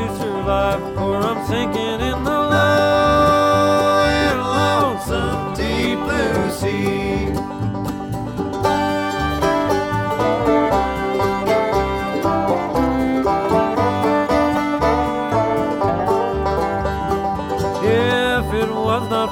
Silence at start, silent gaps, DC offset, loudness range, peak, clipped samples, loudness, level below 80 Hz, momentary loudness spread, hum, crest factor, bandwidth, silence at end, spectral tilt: 0 s; none; under 0.1%; 5 LU; -4 dBFS; under 0.1%; -18 LUFS; -34 dBFS; 7 LU; none; 14 dB; 17.5 kHz; 0 s; -6 dB/octave